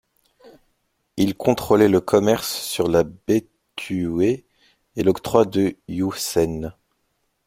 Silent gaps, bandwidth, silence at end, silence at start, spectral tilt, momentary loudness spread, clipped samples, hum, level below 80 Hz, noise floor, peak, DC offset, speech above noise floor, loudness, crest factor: none; 16.5 kHz; 0.75 s; 0.45 s; -5.5 dB/octave; 14 LU; under 0.1%; none; -50 dBFS; -71 dBFS; 0 dBFS; under 0.1%; 51 dB; -21 LUFS; 22 dB